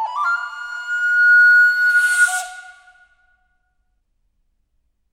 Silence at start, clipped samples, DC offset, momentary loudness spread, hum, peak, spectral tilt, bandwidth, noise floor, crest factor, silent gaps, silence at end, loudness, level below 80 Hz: 0 s; under 0.1%; under 0.1%; 17 LU; none; -4 dBFS; 5.5 dB/octave; 16.5 kHz; -66 dBFS; 14 dB; none; 2.4 s; -14 LUFS; -68 dBFS